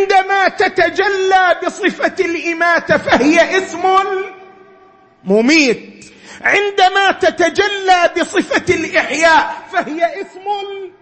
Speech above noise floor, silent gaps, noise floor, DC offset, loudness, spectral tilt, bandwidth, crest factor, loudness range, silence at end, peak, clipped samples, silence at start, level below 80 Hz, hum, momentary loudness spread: 32 dB; none; -46 dBFS; under 0.1%; -13 LUFS; -3.5 dB/octave; 8.8 kHz; 14 dB; 2 LU; 0.15 s; 0 dBFS; under 0.1%; 0 s; -50 dBFS; none; 10 LU